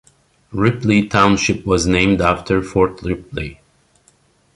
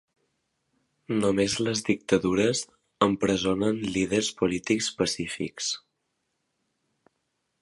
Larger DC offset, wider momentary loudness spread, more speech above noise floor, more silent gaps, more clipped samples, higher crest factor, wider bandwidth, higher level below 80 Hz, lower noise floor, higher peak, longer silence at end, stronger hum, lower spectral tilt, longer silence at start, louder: neither; first, 14 LU vs 7 LU; second, 40 dB vs 52 dB; neither; neither; second, 16 dB vs 22 dB; about the same, 11.5 kHz vs 11.5 kHz; first, -36 dBFS vs -56 dBFS; second, -56 dBFS vs -78 dBFS; first, -2 dBFS vs -6 dBFS; second, 1.05 s vs 1.85 s; neither; first, -5.5 dB/octave vs -4 dB/octave; second, 0.5 s vs 1.1 s; first, -16 LUFS vs -26 LUFS